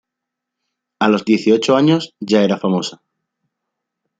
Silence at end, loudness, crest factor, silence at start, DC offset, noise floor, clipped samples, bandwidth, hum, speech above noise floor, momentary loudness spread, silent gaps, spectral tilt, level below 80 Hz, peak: 1.25 s; -16 LUFS; 16 dB; 1 s; under 0.1%; -81 dBFS; under 0.1%; 9 kHz; none; 66 dB; 6 LU; none; -6 dB/octave; -62 dBFS; -2 dBFS